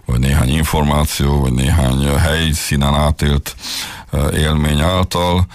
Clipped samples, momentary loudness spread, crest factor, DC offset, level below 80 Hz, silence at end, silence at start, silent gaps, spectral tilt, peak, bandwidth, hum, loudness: under 0.1%; 5 LU; 10 dB; under 0.1%; -20 dBFS; 0 s; 0.1 s; none; -5 dB/octave; -4 dBFS; 15.5 kHz; none; -15 LUFS